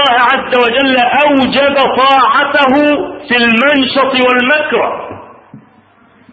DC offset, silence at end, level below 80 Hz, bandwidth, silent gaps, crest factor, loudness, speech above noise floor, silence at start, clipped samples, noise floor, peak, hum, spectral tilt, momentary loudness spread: under 0.1%; 0.75 s; -48 dBFS; 7.6 kHz; none; 10 dB; -9 LUFS; 36 dB; 0 s; under 0.1%; -46 dBFS; 0 dBFS; none; -5.5 dB/octave; 6 LU